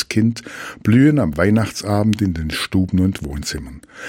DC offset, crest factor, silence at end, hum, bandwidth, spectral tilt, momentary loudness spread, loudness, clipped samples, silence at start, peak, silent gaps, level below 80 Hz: under 0.1%; 16 dB; 0 s; none; 16.5 kHz; -6 dB/octave; 14 LU; -18 LUFS; under 0.1%; 0 s; -2 dBFS; none; -36 dBFS